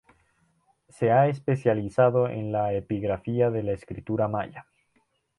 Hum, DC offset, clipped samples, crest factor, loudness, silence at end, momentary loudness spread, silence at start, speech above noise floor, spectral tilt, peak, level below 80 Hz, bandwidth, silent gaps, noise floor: none; under 0.1%; under 0.1%; 18 dB; -25 LUFS; 0.8 s; 10 LU; 1 s; 45 dB; -9 dB/octave; -8 dBFS; -56 dBFS; 11 kHz; none; -70 dBFS